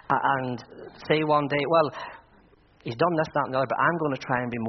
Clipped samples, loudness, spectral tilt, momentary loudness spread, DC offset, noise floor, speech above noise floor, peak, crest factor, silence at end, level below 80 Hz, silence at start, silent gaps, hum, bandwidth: under 0.1%; -25 LUFS; -4 dB/octave; 17 LU; under 0.1%; -57 dBFS; 32 dB; -6 dBFS; 20 dB; 0 s; -62 dBFS; 0.1 s; none; none; 6.2 kHz